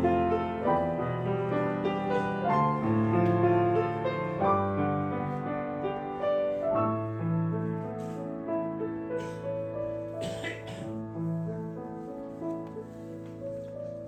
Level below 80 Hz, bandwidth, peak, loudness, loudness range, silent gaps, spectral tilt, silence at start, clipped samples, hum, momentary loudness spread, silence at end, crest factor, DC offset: -58 dBFS; 9 kHz; -14 dBFS; -30 LUFS; 9 LU; none; -8.5 dB/octave; 0 s; under 0.1%; none; 12 LU; 0 s; 16 dB; under 0.1%